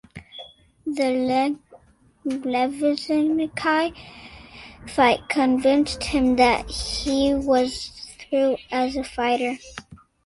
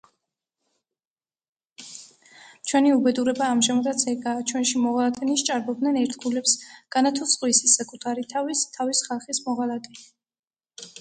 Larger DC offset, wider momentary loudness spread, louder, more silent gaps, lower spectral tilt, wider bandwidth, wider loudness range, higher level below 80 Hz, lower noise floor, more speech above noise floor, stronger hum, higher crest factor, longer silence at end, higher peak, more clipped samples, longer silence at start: neither; first, 21 LU vs 15 LU; about the same, -22 LUFS vs -23 LUFS; second, none vs 10.39-10.43 s; first, -4 dB/octave vs -1.5 dB/octave; first, 11.5 kHz vs 9.6 kHz; about the same, 4 LU vs 4 LU; first, -46 dBFS vs -72 dBFS; second, -55 dBFS vs under -90 dBFS; second, 33 dB vs over 66 dB; neither; about the same, 18 dB vs 20 dB; first, 0.3 s vs 0 s; about the same, -4 dBFS vs -6 dBFS; neither; second, 0.15 s vs 1.8 s